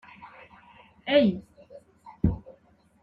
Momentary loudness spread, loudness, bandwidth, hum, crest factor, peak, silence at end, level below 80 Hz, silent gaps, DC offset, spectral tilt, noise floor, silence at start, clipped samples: 26 LU; -25 LUFS; 5.4 kHz; none; 22 dB; -8 dBFS; 0.5 s; -46 dBFS; none; under 0.1%; -9 dB/octave; -60 dBFS; 0.2 s; under 0.1%